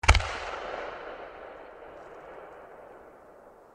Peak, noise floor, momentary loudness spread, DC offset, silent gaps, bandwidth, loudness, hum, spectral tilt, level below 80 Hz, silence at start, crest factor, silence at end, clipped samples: -2 dBFS; -53 dBFS; 20 LU; under 0.1%; none; 12 kHz; -33 LUFS; none; -3.5 dB/octave; -36 dBFS; 0.05 s; 32 dB; 0.2 s; under 0.1%